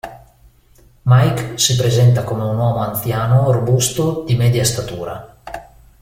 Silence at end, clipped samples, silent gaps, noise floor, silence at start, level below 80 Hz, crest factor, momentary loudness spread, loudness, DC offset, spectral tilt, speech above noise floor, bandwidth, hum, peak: 0.4 s; under 0.1%; none; -49 dBFS; 0.05 s; -42 dBFS; 16 dB; 19 LU; -16 LUFS; under 0.1%; -5 dB/octave; 34 dB; 16.5 kHz; none; 0 dBFS